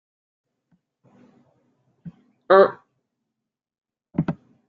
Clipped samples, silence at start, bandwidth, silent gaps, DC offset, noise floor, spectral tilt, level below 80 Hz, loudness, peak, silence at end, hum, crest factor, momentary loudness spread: under 0.1%; 2.05 s; 4.8 kHz; none; under 0.1%; -84 dBFS; -5.5 dB/octave; -66 dBFS; -20 LUFS; -2 dBFS; 0.35 s; none; 24 dB; 15 LU